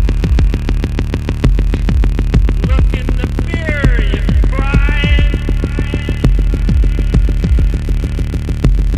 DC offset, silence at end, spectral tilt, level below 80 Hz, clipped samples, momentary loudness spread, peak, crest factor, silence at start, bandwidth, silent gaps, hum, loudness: under 0.1%; 0 s; -7 dB/octave; -12 dBFS; under 0.1%; 4 LU; 0 dBFS; 10 dB; 0 s; 8 kHz; none; none; -15 LUFS